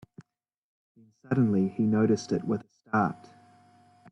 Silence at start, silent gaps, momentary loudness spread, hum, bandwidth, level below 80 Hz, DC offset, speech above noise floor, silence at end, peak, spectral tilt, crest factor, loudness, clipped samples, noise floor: 1.3 s; none; 8 LU; none; 8.6 kHz; -68 dBFS; under 0.1%; 42 dB; 0.95 s; -14 dBFS; -7.5 dB/octave; 16 dB; -27 LUFS; under 0.1%; -68 dBFS